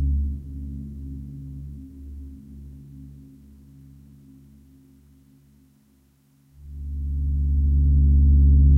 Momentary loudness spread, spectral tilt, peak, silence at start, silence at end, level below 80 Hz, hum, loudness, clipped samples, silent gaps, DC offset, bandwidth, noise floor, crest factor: 26 LU; -12 dB/octave; -8 dBFS; 0 s; 0 s; -24 dBFS; none; -22 LUFS; under 0.1%; none; under 0.1%; 0.5 kHz; -60 dBFS; 14 dB